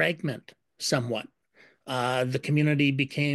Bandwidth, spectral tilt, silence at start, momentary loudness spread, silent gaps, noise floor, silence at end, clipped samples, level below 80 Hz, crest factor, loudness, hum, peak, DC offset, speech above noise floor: 12.5 kHz; -5.5 dB/octave; 0 s; 13 LU; none; -60 dBFS; 0 s; under 0.1%; -70 dBFS; 18 dB; -27 LUFS; none; -10 dBFS; under 0.1%; 34 dB